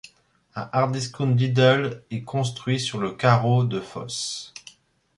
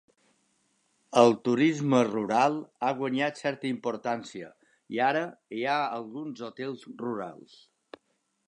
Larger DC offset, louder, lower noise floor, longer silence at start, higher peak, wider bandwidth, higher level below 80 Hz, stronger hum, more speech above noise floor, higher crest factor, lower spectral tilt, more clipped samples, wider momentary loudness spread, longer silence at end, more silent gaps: neither; first, -23 LUFS vs -28 LUFS; second, -60 dBFS vs -75 dBFS; second, 0.55 s vs 1.1 s; about the same, -4 dBFS vs -6 dBFS; about the same, 11.5 kHz vs 10.5 kHz; first, -60 dBFS vs -80 dBFS; neither; second, 37 dB vs 48 dB; about the same, 20 dB vs 24 dB; about the same, -5.5 dB/octave vs -5.5 dB/octave; neither; about the same, 15 LU vs 15 LU; second, 0.6 s vs 1.1 s; neither